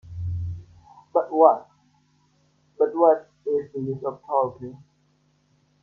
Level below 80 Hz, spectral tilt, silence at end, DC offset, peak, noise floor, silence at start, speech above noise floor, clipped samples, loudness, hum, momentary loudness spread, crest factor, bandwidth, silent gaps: -56 dBFS; -10.5 dB/octave; 1.05 s; under 0.1%; 0 dBFS; -65 dBFS; 0.05 s; 43 dB; under 0.1%; -23 LUFS; none; 16 LU; 24 dB; 6.2 kHz; none